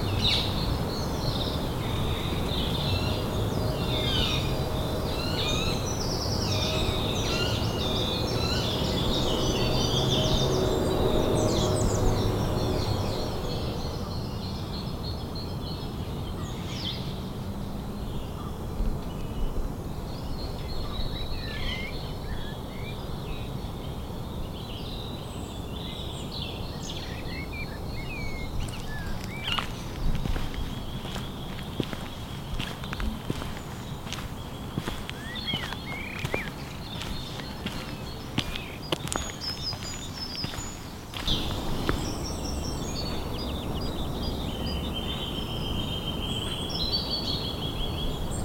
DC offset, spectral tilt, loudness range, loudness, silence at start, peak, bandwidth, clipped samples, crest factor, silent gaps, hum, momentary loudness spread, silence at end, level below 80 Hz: under 0.1%; -5 dB/octave; 9 LU; -30 LUFS; 0 s; -6 dBFS; 17 kHz; under 0.1%; 24 dB; none; none; 10 LU; 0 s; -36 dBFS